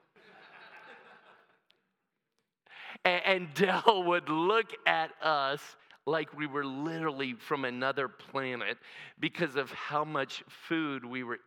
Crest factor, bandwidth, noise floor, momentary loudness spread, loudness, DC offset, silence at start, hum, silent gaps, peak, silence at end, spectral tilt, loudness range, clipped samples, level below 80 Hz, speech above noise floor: 28 dB; 18 kHz; -84 dBFS; 15 LU; -32 LUFS; under 0.1%; 0.35 s; none; none; -6 dBFS; 0.1 s; -5 dB/octave; 6 LU; under 0.1%; under -90 dBFS; 52 dB